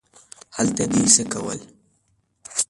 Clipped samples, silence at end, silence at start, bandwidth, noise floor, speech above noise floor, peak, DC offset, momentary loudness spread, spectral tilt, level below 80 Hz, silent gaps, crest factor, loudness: under 0.1%; 0.05 s; 0.55 s; 11.5 kHz; -67 dBFS; 46 dB; -2 dBFS; under 0.1%; 18 LU; -3 dB/octave; -54 dBFS; none; 22 dB; -19 LUFS